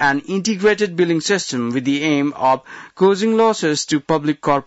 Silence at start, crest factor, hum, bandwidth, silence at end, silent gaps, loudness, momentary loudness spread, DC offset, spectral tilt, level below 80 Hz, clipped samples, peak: 0 s; 12 dB; none; 8.2 kHz; 0.05 s; none; -18 LUFS; 5 LU; under 0.1%; -4.5 dB/octave; -58 dBFS; under 0.1%; -6 dBFS